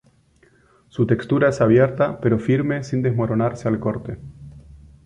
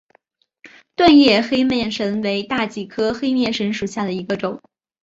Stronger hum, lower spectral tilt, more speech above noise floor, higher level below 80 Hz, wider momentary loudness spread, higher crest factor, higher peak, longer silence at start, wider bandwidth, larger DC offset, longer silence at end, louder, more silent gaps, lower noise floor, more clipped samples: neither; first, -8.5 dB/octave vs -5 dB/octave; second, 38 dB vs 43 dB; about the same, -48 dBFS vs -52 dBFS; first, 16 LU vs 13 LU; about the same, 18 dB vs 18 dB; second, -4 dBFS vs 0 dBFS; first, 0.95 s vs 0.65 s; first, 9.6 kHz vs 7.8 kHz; neither; second, 0.3 s vs 0.45 s; about the same, -20 LUFS vs -18 LUFS; neither; second, -57 dBFS vs -61 dBFS; neither